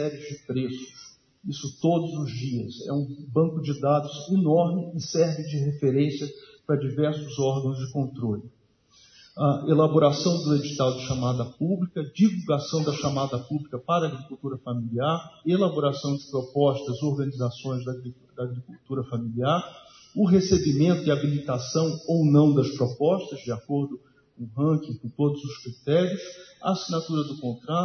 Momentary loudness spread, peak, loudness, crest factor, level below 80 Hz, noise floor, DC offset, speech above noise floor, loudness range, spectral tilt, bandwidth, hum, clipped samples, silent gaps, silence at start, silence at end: 13 LU; -6 dBFS; -26 LUFS; 20 dB; -60 dBFS; -60 dBFS; under 0.1%; 35 dB; 5 LU; -7 dB/octave; 6.6 kHz; none; under 0.1%; none; 0 s; 0 s